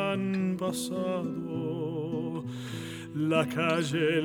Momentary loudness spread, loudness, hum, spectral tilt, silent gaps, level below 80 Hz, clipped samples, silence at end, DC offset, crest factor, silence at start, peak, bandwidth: 10 LU; -31 LUFS; none; -5.5 dB/octave; none; -68 dBFS; under 0.1%; 0 s; under 0.1%; 18 dB; 0 s; -12 dBFS; 18.5 kHz